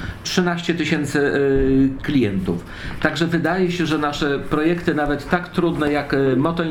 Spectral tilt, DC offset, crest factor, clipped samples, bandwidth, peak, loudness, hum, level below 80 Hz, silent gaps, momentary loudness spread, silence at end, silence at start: -6 dB/octave; under 0.1%; 18 dB; under 0.1%; 16.5 kHz; 0 dBFS; -20 LUFS; none; -36 dBFS; none; 5 LU; 0 s; 0 s